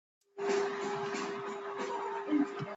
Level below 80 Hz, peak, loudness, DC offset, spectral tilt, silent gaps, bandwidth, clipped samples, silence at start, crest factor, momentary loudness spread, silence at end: -80 dBFS; -20 dBFS; -36 LUFS; under 0.1%; -5 dB/octave; none; 8 kHz; under 0.1%; 0.35 s; 16 dB; 7 LU; 0 s